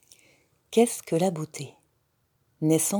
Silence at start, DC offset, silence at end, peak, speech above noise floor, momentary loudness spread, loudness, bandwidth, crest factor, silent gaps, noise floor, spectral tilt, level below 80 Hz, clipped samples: 0.7 s; under 0.1%; 0 s; -8 dBFS; 47 dB; 15 LU; -26 LUFS; over 20 kHz; 20 dB; none; -71 dBFS; -5 dB/octave; -76 dBFS; under 0.1%